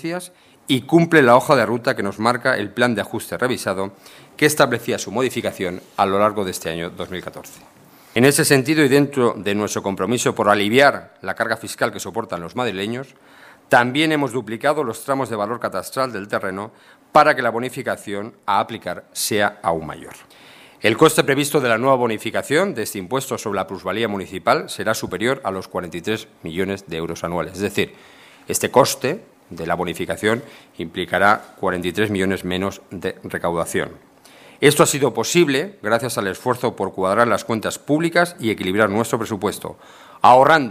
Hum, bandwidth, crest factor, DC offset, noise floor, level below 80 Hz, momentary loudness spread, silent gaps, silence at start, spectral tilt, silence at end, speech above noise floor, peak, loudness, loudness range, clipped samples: none; 16 kHz; 20 dB; under 0.1%; -46 dBFS; -58 dBFS; 13 LU; none; 0 s; -4.5 dB/octave; 0 s; 27 dB; 0 dBFS; -19 LUFS; 5 LU; under 0.1%